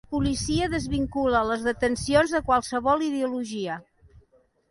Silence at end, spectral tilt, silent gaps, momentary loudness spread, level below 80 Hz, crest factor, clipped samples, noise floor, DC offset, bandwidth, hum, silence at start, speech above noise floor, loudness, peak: 0.9 s; -5 dB/octave; none; 8 LU; -42 dBFS; 18 dB; under 0.1%; -63 dBFS; under 0.1%; 11.5 kHz; none; 0.1 s; 38 dB; -25 LUFS; -8 dBFS